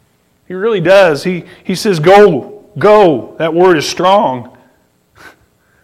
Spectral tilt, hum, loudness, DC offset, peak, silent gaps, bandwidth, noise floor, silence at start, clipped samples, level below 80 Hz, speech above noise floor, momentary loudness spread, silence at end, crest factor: -5.5 dB/octave; none; -10 LUFS; under 0.1%; 0 dBFS; none; 15.5 kHz; -53 dBFS; 0.5 s; under 0.1%; -50 dBFS; 44 dB; 14 LU; 0.55 s; 12 dB